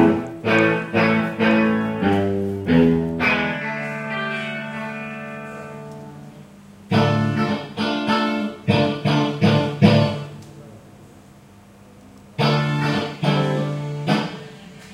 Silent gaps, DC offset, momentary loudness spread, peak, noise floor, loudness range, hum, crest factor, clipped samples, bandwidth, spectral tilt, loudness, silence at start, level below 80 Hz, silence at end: none; under 0.1%; 18 LU; 0 dBFS; -46 dBFS; 7 LU; none; 20 dB; under 0.1%; 12.5 kHz; -7 dB/octave; -20 LUFS; 0 s; -54 dBFS; 0 s